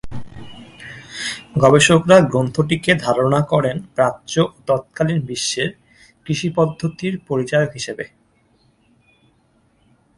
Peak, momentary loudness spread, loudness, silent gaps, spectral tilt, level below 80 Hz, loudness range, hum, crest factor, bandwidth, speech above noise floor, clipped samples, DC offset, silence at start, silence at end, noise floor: 0 dBFS; 21 LU; -18 LUFS; none; -5 dB/octave; -50 dBFS; 8 LU; none; 20 dB; 11.5 kHz; 42 dB; under 0.1%; under 0.1%; 0.05 s; 2.1 s; -59 dBFS